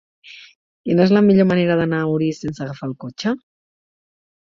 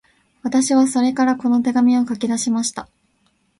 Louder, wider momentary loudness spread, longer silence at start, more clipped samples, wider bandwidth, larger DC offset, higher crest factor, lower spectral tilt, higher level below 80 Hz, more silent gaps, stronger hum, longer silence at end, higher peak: about the same, -18 LUFS vs -18 LUFS; first, 16 LU vs 8 LU; second, 0.25 s vs 0.45 s; neither; second, 7.4 kHz vs 11.5 kHz; neither; about the same, 16 dB vs 14 dB; first, -7.5 dB/octave vs -3.5 dB/octave; first, -56 dBFS vs -62 dBFS; first, 0.55-0.84 s vs none; neither; first, 1.05 s vs 0.75 s; about the same, -2 dBFS vs -4 dBFS